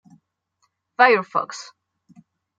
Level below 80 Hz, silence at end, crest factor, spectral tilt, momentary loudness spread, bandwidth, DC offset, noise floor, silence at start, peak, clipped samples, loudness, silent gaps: -80 dBFS; 0.95 s; 22 dB; -3.5 dB/octave; 22 LU; 7.8 kHz; under 0.1%; -71 dBFS; 1 s; -2 dBFS; under 0.1%; -19 LUFS; none